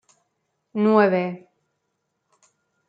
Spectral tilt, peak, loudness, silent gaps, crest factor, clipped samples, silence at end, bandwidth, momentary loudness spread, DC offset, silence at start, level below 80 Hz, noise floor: -8.5 dB/octave; -4 dBFS; -20 LUFS; none; 20 dB; under 0.1%; 1.5 s; 7.4 kHz; 17 LU; under 0.1%; 0.75 s; -76 dBFS; -76 dBFS